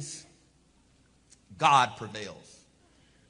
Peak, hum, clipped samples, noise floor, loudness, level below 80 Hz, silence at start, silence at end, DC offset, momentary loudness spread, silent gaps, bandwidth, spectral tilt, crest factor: -6 dBFS; none; under 0.1%; -64 dBFS; -26 LUFS; -70 dBFS; 0 s; 0.95 s; under 0.1%; 22 LU; none; 10.5 kHz; -3 dB/octave; 26 dB